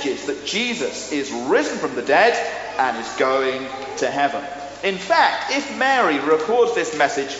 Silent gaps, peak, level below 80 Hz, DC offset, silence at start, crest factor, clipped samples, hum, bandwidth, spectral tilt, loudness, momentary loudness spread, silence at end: none; -2 dBFS; -58 dBFS; under 0.1%; 0 s; 18 dB; under 0.1%; none; 8 kHz; -1 dB/octave; -20 LUFS; 9 LU; 0 s